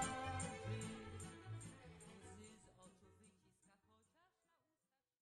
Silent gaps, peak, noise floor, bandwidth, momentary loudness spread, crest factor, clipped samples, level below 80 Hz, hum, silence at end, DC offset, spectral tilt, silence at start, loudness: none; -30 dBFS; under -90 dBFS; 11.5 kHz; 21 LU; 22 dB; under 0.1%; -72 dBFS; none; 1.25 s; under 0.1%; -4 dB/octave; 0 s; -51 LUFS